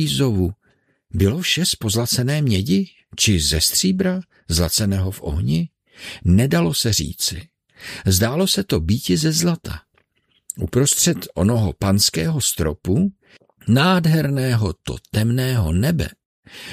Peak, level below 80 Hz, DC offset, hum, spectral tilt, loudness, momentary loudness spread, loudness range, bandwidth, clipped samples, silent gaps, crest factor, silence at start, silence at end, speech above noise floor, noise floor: -4 dBFS; -36 dBFS; under 0.1%; none; -4.5 dB/octave; -19 LUFS; 13 LU; 2 LU; 16 kHz; under 0.1%; 16.25-16.43 s; 16 dB; 0 s; 0 s; 46 dB; -65 dBFS